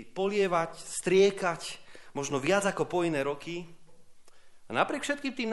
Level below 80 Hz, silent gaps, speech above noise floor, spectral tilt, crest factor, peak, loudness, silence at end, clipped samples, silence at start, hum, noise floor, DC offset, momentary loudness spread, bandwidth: -64 dBFS; none; 21 dB; -4.5 dB/octave; 20 dB; -10 dBFS; -29 LUFS; 0 s; under 0.1%; 0 s; none; -50 dBFS; under 0.1%; 15 LU; 11.5 kHz